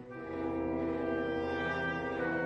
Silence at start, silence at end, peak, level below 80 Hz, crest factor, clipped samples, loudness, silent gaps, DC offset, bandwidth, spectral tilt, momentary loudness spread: 0 s; 0 s; -22 dBFS; -56 dBFS; 12 dB; under 0.1%; -35 LUFS; none; under 0.1%; 7.6 kHz; -7.5 dB/octave; 3 LU